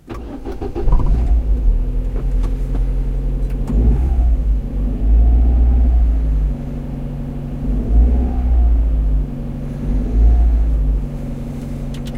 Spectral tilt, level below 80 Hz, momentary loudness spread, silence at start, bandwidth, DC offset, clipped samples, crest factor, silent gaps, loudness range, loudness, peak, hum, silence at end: -9.5 dB/octave; -16 dBFS; 11 LU; 0.05 s; 3.4 kHz; under 0.1%; under 0.1%; 14 dB; none; 3 LU; -19 LUFS; -2 dBFS; none; 0 s